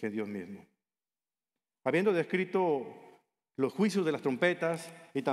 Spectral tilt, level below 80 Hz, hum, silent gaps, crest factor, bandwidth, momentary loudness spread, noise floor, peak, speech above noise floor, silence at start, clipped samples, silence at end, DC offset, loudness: -6 dB/octave; -86 dBFS; none; none; 20 dB; 13.5 kHz; 15 LU; under -90 dBFS; -14 dBFS; over 59 dB; 0 s; under 0.1%; 0 s; under 0.1%; -31 LUFS